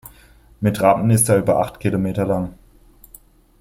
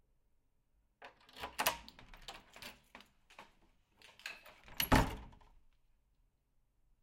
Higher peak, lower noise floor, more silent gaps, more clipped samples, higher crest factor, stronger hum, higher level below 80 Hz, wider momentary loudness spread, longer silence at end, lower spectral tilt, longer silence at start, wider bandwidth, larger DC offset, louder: first, -2 dBFS vs -12 dBFS; second, -49 dBFS vs -77 dBFS; neither; neither; second, 18 dB vs 30 dB; neither; about the same, -46 dBFS vs -50 dBFS; second, 8 LU vs 27 LU; second, 1.05 s vs 1.75 s; first, -6 dB/octave vs -4 dB/octave; second, 0.6 s vs 1 s; about the same, 16.5 kHz vs 16.5 kHz; neither; first, -18 LUFS vs -37 LUFS